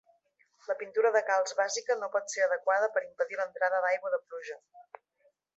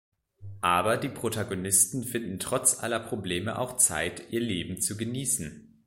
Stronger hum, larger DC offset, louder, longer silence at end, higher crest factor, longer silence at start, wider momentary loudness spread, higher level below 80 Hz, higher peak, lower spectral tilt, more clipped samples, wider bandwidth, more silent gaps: neither; neither; second, -30 LUFS vs -27 LUFS; first, 0.75 s vs 0.2 s; about the same, 18 dB vs 22 dB; first, 0.7 s vs 0.4 s; first, 14 LU vs 9 LU; second, -90 dBFS vs -58 dBFS; second, -14 dBFS vs -6 dBFS; second, 0.5 dB/octave vs -3 dB/octave; neither; second, 8.2 kHz vs 16.5 kHz; neither